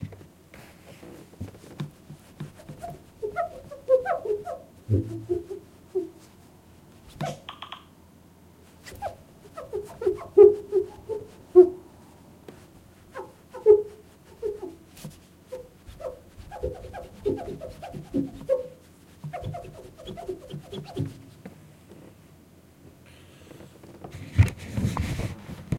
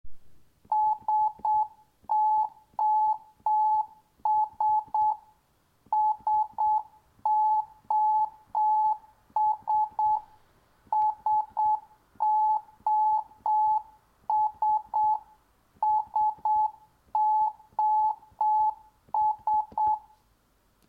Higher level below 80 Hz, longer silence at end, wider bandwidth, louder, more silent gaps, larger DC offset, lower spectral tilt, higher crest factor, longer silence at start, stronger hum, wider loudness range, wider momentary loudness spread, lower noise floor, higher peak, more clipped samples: first, -50 dBFS vs -66 dBFS; second, 0 s vs 0.9 s; first, 15.5 kHz vs 4.5 kHz; about the same, -26 LUFS vs -27 LUFS; neither; neither; first, -8 dB/octave vs -5.5 dB/octave; first, 26 dB vs 10 dB; about the same, 0 s vs 0.05 s; neither; first, 18 LU vs 1 LU; first, 27 LU vs 7 LU; second, -53 dBFS vs -67 dBFS; first, -4 dBFS vs -18 dBFS; neither